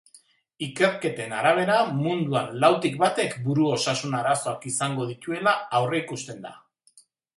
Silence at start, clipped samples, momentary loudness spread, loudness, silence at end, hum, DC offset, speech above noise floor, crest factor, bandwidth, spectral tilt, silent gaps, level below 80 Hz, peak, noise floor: 0.6 s; under 0.1%; 13 LU; -24 LUFS; 0.8 s; none; under 0.1%; 35 dB; 20 dB; 11.5 kHz; -4.5 dB/octave; none; -70 dBFS; -4 dBFS; -59 dBFS